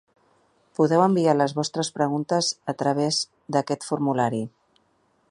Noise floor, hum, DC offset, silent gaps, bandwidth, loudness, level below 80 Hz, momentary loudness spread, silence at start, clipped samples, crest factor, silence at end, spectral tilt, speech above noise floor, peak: -66 dBFS; none; under 0.1%; none; 11.5 kHz; -23 LUFS; -70 dBFS; 8 LU; 0.8 s; under 0.1%; 20 dB; 0.8 s; -5 dB/octave; 43 dB; -6 dBFS